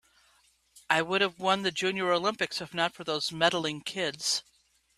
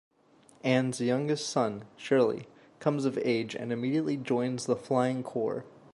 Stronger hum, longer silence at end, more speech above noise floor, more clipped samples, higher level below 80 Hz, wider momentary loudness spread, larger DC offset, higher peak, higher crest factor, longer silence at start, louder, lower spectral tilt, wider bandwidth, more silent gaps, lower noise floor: neither; first, 0.55 s vs 0.25 s; first, 37 dB vs 32 dB; neither; about the same, -70 dBFS vs -74 dBFS; about the same, 6 LU vs 7 LU; neither; first, -8 dBFS vs -12 dBFS; first, 24 dB vs 18 dB; about the same, 0.75 s vs 0.65 s; about the same, -28 LUFS vs -30 LUFS; second, -2.5 dB/octave vs -5.5 dB/octave; first, 14 kHz vs 11.5 kHz; neither; first, -66 dBFS vs -61 dBFS